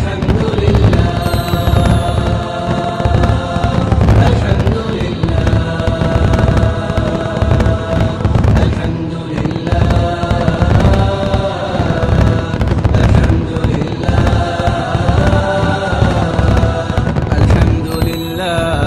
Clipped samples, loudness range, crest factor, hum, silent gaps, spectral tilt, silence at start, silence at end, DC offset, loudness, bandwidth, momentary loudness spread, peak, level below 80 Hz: under 0.1%; 1 LU; 12 dB; none; none; -7.5 dB/octave; 0 s; 0 s; 0.5%; -14 LUFS; 13 kHz; 6 LU; 0 dBFS; -18 dBFS